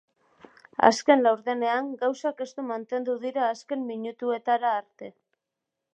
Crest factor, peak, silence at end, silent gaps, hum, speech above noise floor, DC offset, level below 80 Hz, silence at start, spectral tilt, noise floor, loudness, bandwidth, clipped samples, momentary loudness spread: 26 dB; -2 dBFS; 0.85 s; none; none; 60 dB; under 0.1%; -78 dBFS; 0.8 s; -3.5 dB/octave; -85 dBFS; -26 LUFS; 9.6 kHz; under 0.1%; 13 LU